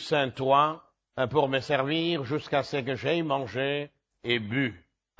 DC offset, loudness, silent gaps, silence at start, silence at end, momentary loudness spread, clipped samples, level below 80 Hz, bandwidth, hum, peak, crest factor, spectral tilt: under 0.1%; -27 LUFS; none; 0 s; 0.4 s; 9 LU; under 0.1%; -62 dBFS; 8 kHz; none; -10 dBFS; 18 dB; -6 dB/octave